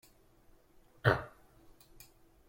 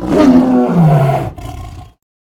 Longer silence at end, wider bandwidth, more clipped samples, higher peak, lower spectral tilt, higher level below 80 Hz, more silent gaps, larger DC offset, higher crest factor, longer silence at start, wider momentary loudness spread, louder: first, 1.2 s vs 0.35 s; first, 16.5 kHz vs 14.5 kHz; second, under 0.1% vs 0.1%; second, -12 dBFS vs 0 dBFS; second, -6.5 dB/octave vs -8.5 dB/octave; second, -60 dBFS vs -34 dBFS; neither; neither; first, 28 dB vs 12 dB; first, 1.05 s vs 0 s; first, 27 LU vs 20 LU; second, -33 LUFS vs -10 LUFS